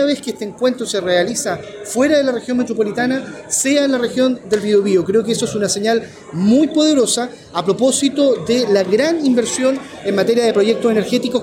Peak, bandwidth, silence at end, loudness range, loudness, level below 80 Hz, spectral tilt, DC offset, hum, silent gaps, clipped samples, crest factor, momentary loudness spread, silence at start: -4 dBFS; 16.5 kHz; 0 s; 2 LU; -16 LUFS; -56 dBFS; -4 dB/octave; under 0.1%; none; none; under 0.1%; 12 dB; 7 LU; 0 s